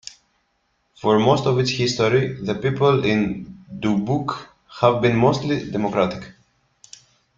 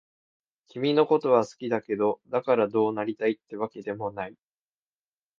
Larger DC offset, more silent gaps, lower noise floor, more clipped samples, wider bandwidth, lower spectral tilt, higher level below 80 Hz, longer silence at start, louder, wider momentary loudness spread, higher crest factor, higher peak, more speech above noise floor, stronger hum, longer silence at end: neither; neither; second, -68 dBFS vs under -90 dBFS; neither; about the same, 7.6 kHz vs 7.4 kHz; about the same, -6 dB/octave vs -6.5 dB/octave; first, -52 dBFS vs -72 dBFS; first, 1.05 s vs 0.75 s; first, -20 LUFS vs -26 LUFS; about the same, 14 LU vs 12 LU; about the same, 20 dB vs 20 dB; first, -2 dBFS vs -8 dBFS; second, 49 dB vs over 64 dB; neither; about the same, 1.05 s vs 1.05 s